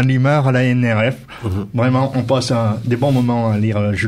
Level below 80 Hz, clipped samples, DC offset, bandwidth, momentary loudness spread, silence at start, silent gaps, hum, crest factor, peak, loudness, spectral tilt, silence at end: -46 dBFS; under 0.1%; under 0.1%; 11.5 kHz; 7 LU; 0 s; none; none; 12 dB; -4 dBFS; -17 LUFS; -7 dB/octave; 0 s